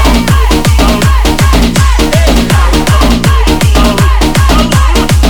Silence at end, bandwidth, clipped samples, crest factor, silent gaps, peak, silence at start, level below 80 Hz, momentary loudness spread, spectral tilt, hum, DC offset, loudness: 0 s; 20 kHz; 0.2%; 6 dB; none; 0 dBFS; 0 s; -8 dBFS; 1 LU; -5 dB/octave; none; under 0.1%; -8 LUFS